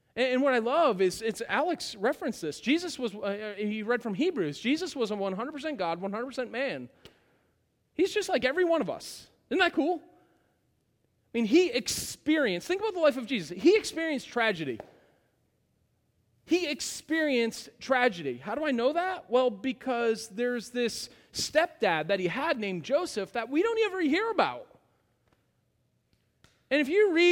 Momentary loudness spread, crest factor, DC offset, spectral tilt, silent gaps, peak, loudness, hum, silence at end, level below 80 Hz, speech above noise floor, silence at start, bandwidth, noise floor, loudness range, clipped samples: 9 LU; 20 dB; under 0.1%; -4 dB/octave; none; -10 dBFS; -29 LUFS; none; 0 s; -68 dBFS; 45 dB; 0.15 s; 17.5 kHz; -73 dBFS; 4 LU; under 0.1%